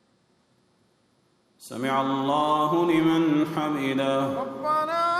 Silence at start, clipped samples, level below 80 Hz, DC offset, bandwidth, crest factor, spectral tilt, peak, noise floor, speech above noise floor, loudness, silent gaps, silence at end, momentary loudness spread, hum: 1.6 s; under 0.1%; -66 dBFS; under 0.1%; 15 kHz; 14 dB; -6 dB/octave; -12 dBFS; -66 dBFS; 42 dB; -24 LUFS; none; 0 s; 7 LU; none